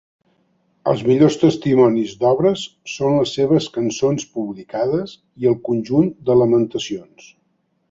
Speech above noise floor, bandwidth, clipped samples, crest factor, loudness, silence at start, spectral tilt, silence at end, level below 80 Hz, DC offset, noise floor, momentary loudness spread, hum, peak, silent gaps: 49 dB; 7.8 kHz; under 0.1%; 16 dB; -18 LUFS; 0.85 s; -6.5 dB/octave; 0.9 s; -56 dBFS; under 0.1%; -66 dBFS; 12 LU; none; -2 dBFS; none